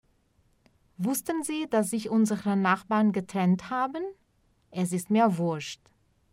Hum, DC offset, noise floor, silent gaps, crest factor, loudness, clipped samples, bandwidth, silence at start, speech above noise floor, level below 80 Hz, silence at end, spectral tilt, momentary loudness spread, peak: none; under 0.1%; -67 dBFS; none; 18 dB; -27 LUFS; under 0.1%; 16 kHz; 1 s; 41 dB; -68 dBFS; 0.6 s; -5.5 dB/octave; 11 LU; -10 dBFS